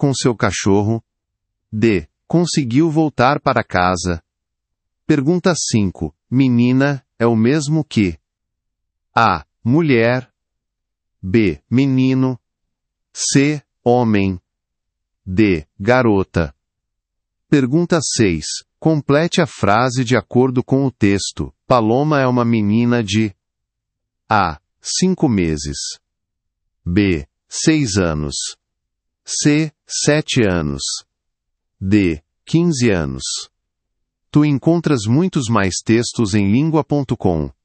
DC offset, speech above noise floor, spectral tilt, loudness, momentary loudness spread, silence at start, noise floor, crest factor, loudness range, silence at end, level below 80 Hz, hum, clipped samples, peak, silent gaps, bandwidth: under 0.1%; 63 dB; -5.5 dB/octave; -17 LUFS; 9 LU; 0 s; -78 dBFS; 18 dB; 3 LU; 0.15 s; -44 dBFS; none; under 0.1%; 0 dBFS; none; 8.8 kHz